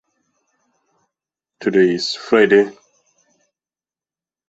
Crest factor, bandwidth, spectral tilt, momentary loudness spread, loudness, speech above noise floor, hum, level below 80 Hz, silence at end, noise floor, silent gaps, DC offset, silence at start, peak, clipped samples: 18 dB; 8 kHz; -5 dB/octave; 11 LU; -16 LUFS; over 75 dB; none; -64 dBFS; 1.8 s; under -90 dBFS; none; under 0.1%; 1.6 s; -2 dBFS; under 0.1%